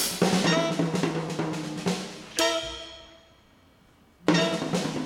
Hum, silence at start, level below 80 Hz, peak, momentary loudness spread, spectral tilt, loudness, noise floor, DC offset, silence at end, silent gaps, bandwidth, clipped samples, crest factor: none; 0 s; -58 dBFS; -6 dBFS; 11 LU; -4 dB/octave; -26 LUFS; -58 dBFS; under 0.1%; 0 s; none; 18 kHz; under 0.1%; 20 dB